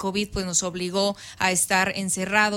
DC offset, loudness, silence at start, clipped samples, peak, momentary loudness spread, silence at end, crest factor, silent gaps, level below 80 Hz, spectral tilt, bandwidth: under 0.1%; -23 LUFS; 0 s; under 0.1%; -6 dBFS; 6 LU; 0 s; 18 dB; none; -48 dBFS; -2.5 dB/octave; 16.5 kHz